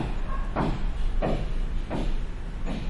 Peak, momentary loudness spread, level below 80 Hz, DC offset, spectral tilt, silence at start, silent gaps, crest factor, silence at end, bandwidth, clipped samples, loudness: -14 dBFS; 7 LU; -28 dBFS; under 0.1%; -7 dB/octave; 0 s; none; 12 dB; 0 s; 7.8 kHz; under 0.1%; -32 LUFS